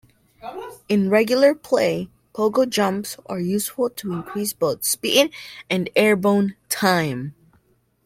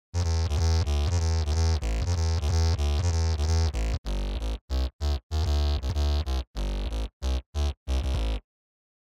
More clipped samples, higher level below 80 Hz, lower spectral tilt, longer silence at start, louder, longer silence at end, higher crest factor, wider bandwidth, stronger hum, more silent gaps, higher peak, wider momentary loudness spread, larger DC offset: neither; second, -62 dBFS vs -28 dBFS; second, -4 dB/octave vs -5.5 dB/octave; first, 0.45 s vs 0.15 s; first, -21 LUFS vs -28 LUFS; about the same, 0.75 s vs 0.7 s; first, 20 dB vs 14 dB; first, 16.5 kHz vs 11 kHz; neither; second, none vs 3.98-4.04 s, 4.61-4.68 s, 4.93-4.99 s, 5.23-5.30 s, 6.47-6.54 s, 7.13-7.20 s, 7.46-7.53 s, 7.77-7.86 s; first, -2 dBFS vs -12 dBFS; first, 17 LU vs 7 LU; neither